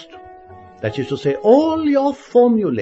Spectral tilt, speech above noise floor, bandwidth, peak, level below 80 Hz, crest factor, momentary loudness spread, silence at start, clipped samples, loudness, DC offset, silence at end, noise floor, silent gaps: -7.5 dB/octave; 25 dB; 7.8 kHz; 0 dBFS; -56 dBFS; 16 dB; 11 LU; 0 s; under 0.1%; -16 LUFS; under 0.1%; 0 s; -41 dBFS; none